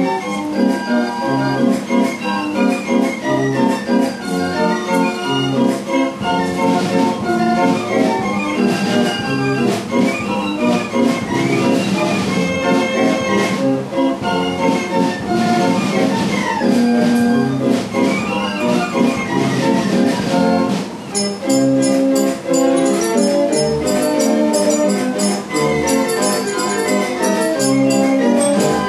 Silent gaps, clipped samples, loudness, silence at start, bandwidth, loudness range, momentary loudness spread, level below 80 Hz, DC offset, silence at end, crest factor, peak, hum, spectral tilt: none; under 0.1%; -16 LUFS; 0 s; 14.5 kHz; 2 LU; 4 LU; -50 dBFS; under 0.1%; 0 s; 14 dB; -2 dBFS; none; -5 dB/octave